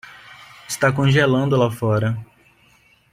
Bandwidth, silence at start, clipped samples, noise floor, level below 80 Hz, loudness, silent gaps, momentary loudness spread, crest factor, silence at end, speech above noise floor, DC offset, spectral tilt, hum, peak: 15.5 kHz; 0.05 s; under 0.1%; -56 dBFS; -52 dBFS; -19 LUFS; none; 16 LU; 18 dB; 0.9 s; 38 dB; under 0.1%; -6 dB/octave; none; -4 dBFS